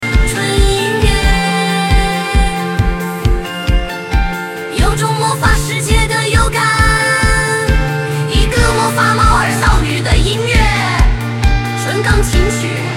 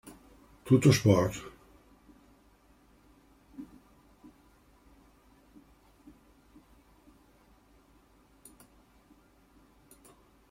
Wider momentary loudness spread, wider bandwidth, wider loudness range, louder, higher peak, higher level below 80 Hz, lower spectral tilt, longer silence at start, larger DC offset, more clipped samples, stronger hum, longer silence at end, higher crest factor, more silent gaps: second, 6 LU vs 31 LU; about the same, 16.5 kHz vs 16 kHz; second, 4 LU vs 27 LU; first, -13 LUFS vs -26 LUFS; first, 0 dBFS vs -8 dBFS; first, -16 dBFS vs -62 dBFS; second, -4.5 dB/octave vs -6.5 dB/octave; second, 0 s vs 0.65 s; first, 0.3% vs under 0.1%; neither; neither; second, 0 s vs 6.85 s; second, 12 dB vs 26 dB; neither